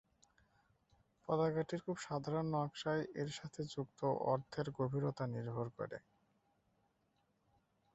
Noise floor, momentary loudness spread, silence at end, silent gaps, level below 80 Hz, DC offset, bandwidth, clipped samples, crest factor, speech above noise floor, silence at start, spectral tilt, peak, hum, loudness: -80 dBFS; 8 LU; 1.95 s; none; -74 dBFS; under 0.1%; 8 kHz; under 0.1%; 20 dB; 40 dB; 1.3 s; -6 dB/octave; -22 dBFS; none; -41 LUFS